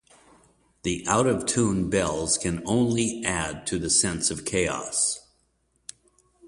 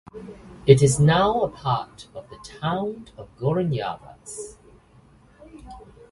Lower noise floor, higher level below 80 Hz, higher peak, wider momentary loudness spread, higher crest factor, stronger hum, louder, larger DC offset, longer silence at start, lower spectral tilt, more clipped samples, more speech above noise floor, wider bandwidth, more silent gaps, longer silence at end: first, -69 dBFS vs -54 dBFS; about the same, -48 dBFS vs -50 dBFS; second, -6 dBFS vs 0 dBFS; second, 12 LU vs 25 LU; about the same, 20 dB vs 24 dB; neither; about the same, -24 LUFS vs -22 LUFS; neither; first, 0.85 s vs 0.15 s; second, -3.5 dB/octave vs -6 dB/octave; neither; first, 44 dB vs 31 dB; about the same, 11.5 kHz vs 11.5 kHz; neither; second, 0 s vs 0.3 s